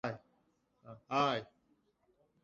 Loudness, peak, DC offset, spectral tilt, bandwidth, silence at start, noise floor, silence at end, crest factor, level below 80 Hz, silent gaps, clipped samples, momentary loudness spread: -36 LUFS; -18 dBFS; under 0.1%; -3 dB/octave; 7.6 kHz; 0.05 s; -76 dBFS; 1 s; 22 dB; -78 dBFS; none; under 0.1%; 24 LU